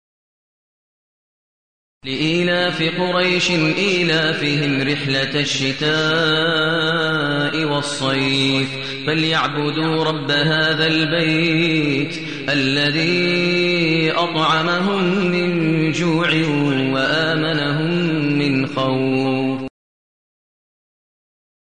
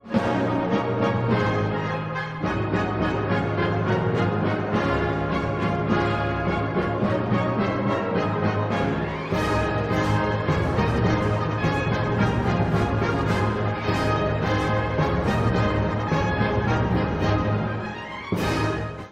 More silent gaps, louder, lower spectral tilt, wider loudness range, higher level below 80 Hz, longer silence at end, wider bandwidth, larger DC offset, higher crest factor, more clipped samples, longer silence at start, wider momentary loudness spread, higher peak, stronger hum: neither; first, -17 LUFS vs -24 LUFS; second, -5 dB/octave vs -7.5 dB/octave; about the same, 3 LU vs 1 LU; second, -54 dBFS vs -38 dBFS; first, 2.05 s vs 0 s; about the same, 9.8 kHz vs 10 kHz; first, 0.7% vs under 0.1%; about the same, 14 dB vs 16 dB; neither; first, 2.05 s vs 0.05 s; about the same, 4 LU vs 3 LU; about the same, -6 dBFS vs -6 dBFS; neither